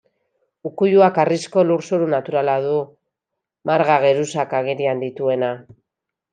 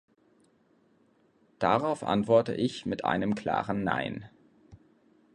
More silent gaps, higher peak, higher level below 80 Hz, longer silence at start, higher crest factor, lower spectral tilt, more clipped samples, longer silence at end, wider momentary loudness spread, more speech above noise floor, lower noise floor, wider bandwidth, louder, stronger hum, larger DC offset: neither; first, -2 dBFS vs -10 dBFS; second, -70 dBFS vs -62 dBFS; second, 0.65 s vs 1.6 s; about the same, 18 dB vs 20 dB; about the same, -6 dB/octave vs -6.5 dB/octave; neither; about the same, 0.7 s vs 0.6 s; first, 12 LU vs 7 LU; first, 65 dB vs 38 dB; first, -83 dBFS vs -66 dBFS; about the same, 9.6 kHz vs 10.5 kHz; first, -18 LUFS vs -29 LUFS; neither; neither